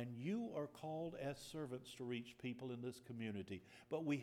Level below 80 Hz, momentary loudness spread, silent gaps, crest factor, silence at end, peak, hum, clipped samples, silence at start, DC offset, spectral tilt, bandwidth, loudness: -78 dBFS; 6 LU; none; 18 dB; 0 s; -30 dBFS; none; under 0.1%; 0 s; under 0.1%; -6.5 dB/octave; 16.5 kHz; -48 LUFS